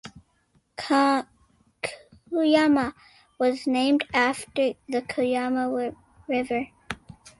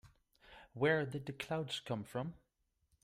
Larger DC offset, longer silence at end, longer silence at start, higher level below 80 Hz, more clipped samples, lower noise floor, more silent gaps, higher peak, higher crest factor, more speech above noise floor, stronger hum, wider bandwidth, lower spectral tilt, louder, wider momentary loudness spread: neither; second, 0.1 s vs 0.7 s; about the same, 0.05 s vs 0.05 s; first, -60 dBFS vs -72 dBFS; neither; second, -67 dBFS vs -80 dBFS; neither; first, -8 dBFS vs -20 dBFS; about the same, 18 dB vs 20 dB; about the same, 43 dB vs 42 dB; neither; second, 11.5 kHz vs 15.5 kHz; second, -4 dB/octave vs -5.5 dB/octave; first, -25 LUFS vs -39 LUFS; about the same, 16 LU vs 15 LU